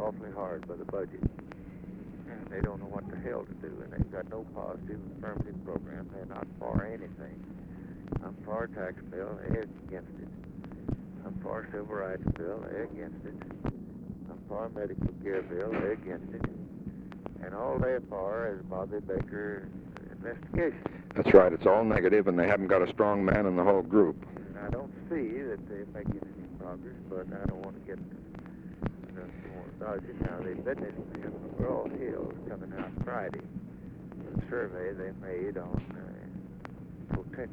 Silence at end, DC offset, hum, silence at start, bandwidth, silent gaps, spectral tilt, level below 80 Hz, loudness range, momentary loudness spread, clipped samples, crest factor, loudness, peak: 0 s; under 0.1%; none; 0 s; 6.4 kHz; none; -9.5 dB/octave; -50 dBFS; 13 LU; 19 LU; under 0.1%; 28 dB; -33 LUFS; -6 dBFS